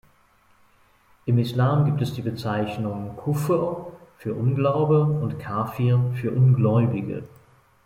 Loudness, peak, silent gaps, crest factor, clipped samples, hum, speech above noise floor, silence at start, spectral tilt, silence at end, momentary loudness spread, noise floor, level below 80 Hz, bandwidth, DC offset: -23 LUFS; -8 dBFS; none; 16 dB; under 0.1%; none; 38 dB; 1.25 s; -8.5 dB/octave; 0.6 s; 12 LU; -60 dBFS; -58 dBFS; 15 kHz; under 0.1%